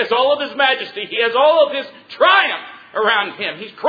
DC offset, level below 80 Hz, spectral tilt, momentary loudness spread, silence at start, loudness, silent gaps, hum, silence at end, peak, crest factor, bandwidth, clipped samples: under 0.1%; -68 dBFS; -4.5 dB/octave; 13 LU; 0 s; -16 LUFS; none; none; 0 s; 0 dBFS; 16 dB; 5 kHz; under 0.1%